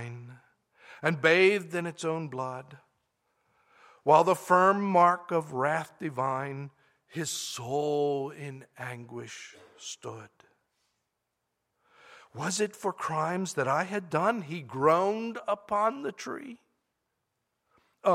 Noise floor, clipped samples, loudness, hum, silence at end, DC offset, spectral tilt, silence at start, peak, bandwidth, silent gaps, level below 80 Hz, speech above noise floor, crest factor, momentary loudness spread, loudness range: -82 dBFS; under 0.1%; -28 LUFS; none; 0 s; under 0.1%; -4.5 dB/octave; 0 s; -6 dBFS; 16 kHz; none; -78 dBFS; 54 dB; 24 dB; 20 LU; 14 LU